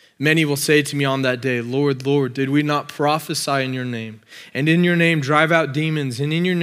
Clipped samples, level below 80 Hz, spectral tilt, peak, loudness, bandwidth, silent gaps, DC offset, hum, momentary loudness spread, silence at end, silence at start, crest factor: under 0.1%; -76 dBFS; -5.5 dB/octave; 0 dBFS; -19 LUFS; 16 kHz; none; under 0.1%; none; 8 LU; 0 s; 0.2 s; 18 dB